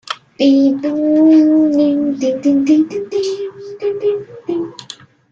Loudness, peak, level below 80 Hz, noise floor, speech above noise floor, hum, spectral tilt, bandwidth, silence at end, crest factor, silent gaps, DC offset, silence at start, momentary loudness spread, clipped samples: -14 LUFS; -2 dBFS; -62 dBFS; -38 dBFS; 24 dB; none; -5.5 dB/octave; 7.6 kHz; 0.4 s; 12 dB; none; under 0.1%; 0.05 s; 17 LU; under 0.1%